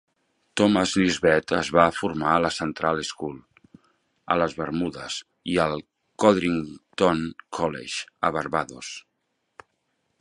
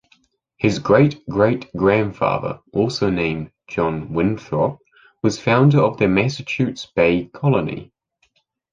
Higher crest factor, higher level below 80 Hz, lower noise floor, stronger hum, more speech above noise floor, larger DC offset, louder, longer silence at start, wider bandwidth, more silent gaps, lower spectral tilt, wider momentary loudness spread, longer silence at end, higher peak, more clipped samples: first, 24 dB vs 18 dB; second, -54 dBFS vs -46 dBFS; first, -76 dBFS vs -65 dBFS; neither; first, 52 dB vs 46 dB; neither; second, -24 LUFS vs -19 LUFS; about the same, 0.55 s vs 0.6 s; first, 11.5 kHz vs 7.6 kHz; neither; second, -5 dB/octave vs -7 dB/octave; first, 14 LU vs 8 LU; first, 1.2 s vs 0.9 s; about the same, -2 dBFS vs -2 dBFS; neither